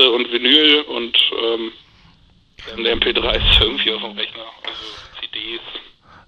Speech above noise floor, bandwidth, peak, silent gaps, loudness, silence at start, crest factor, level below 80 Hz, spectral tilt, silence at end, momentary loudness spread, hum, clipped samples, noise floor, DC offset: 34 dB; 15.5 kHz; 0 dBFS; none; -15 LUFS; 0 s; 18 dB; -32 dBFS; -5 dB/octave; 0.45 s; 19 LU; none; under 0.1%; -52 dBFS; under 0.1%